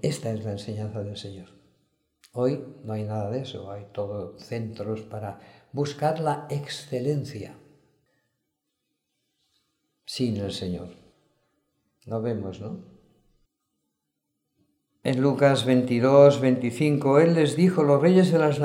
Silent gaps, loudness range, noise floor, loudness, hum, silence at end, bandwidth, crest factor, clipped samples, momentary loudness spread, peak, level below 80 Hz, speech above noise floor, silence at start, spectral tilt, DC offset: none; 17 LU; -80 dBFS; -24 LUFS; none; 0 s; 15.5 kHz; 22 dB; under 0.1%; 19 LU; -4 dBFS; -66 dBFS; 56 dB; 0.05 s; -7 dB/octave; under 0.1%